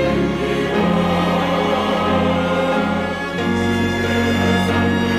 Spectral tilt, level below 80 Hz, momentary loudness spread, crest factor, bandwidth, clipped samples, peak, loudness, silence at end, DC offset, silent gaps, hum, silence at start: -6 dB/octave; -40 dBFS; 3 LU; 12 dB; 15 kHz; under 0.1%; -6 dBFS; -18 LUFS; 0 s; under 0.1%; none; none; 0 s